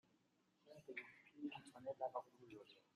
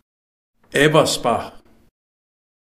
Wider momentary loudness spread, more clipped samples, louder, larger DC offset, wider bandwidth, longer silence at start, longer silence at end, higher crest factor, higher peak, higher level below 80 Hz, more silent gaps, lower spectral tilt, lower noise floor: first, 14 LU vs 10 LU; neither; second, -53 LUFS vs -17 LUFS; neither; second, 13.5 kHz vs 15.5 kHz; about the same, 0.65 s vs 0.75 s; second, 0.15 s vs 1.05 s; about the same, 22 dB vs 22 dB; second, -34 dBFS vs 0 dBFS; second, under -90 dBFS vs -50 dBFS; neither; about the same, -5 dB/octave vs -4 dB/octave; second, -81 dBFS vs under -90 dBFS